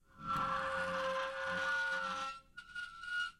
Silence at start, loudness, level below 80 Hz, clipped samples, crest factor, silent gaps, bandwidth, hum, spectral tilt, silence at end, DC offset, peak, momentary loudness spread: 0.15 s; -38 LUFS; -66 dBFS; under 0.1%; 14 dB; none; 16 kHz; none; -3 dB/octave; 0.05 s; under 0.1%; -26 dBFS; 11 LU